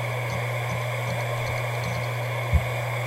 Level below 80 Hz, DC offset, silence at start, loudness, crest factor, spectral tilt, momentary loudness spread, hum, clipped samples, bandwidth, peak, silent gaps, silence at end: -36 dBFS; under 0.1%; 0 s; -27 LUFS; 18 dB; -5.5 dB/octave; 3 LU; none; under 0.1%; 16 kHz; -10 dBFS; none; 0 s